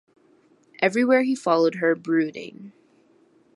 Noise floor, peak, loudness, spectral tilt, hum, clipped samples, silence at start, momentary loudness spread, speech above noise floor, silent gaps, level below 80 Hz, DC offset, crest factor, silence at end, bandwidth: -59 dBFS; -4 dBFS; -22 LUFS; -5.5 dB/octave; none; under 0.1%; 0.8 s; 11 LU; 37 dB; none; -80 dBFS; under 0.1%; 20 dB; 0.85 s; 11.5 kHz